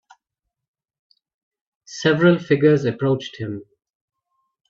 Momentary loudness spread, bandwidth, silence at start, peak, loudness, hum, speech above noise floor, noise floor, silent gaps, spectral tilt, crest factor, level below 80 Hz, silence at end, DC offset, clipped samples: 15 LU; 7.6 kHz; 1.9 s; -4 dBFS; -18 LUFS; none; 64 dB; -82 dBFS; none; -6.5 dB/octave; 18 dB; -62 dBFS; 1.05 s; under 0.1%; under 0.1%